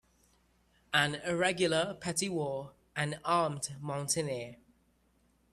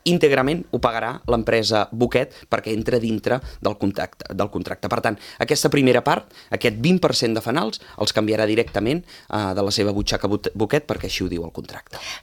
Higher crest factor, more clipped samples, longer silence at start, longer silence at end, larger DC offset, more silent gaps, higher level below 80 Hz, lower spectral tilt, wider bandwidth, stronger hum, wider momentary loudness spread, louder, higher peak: about the same, 24 dB vs 20 dB; neither; first, 0.9 s vs 0.05 s; first, 1 s vs 0.05 s; neither; neither; second, -68 dBFS vs -44 dBFS; second, -3.5 dB/octave vs -5 dB/octave; second, 13.5 kHz vs 18 kHz; neither; about the same, 10 LU vs 10 LU; second, -33 LUFS vs -21 LUFS; second, -12 dBFS vs 0 dBFS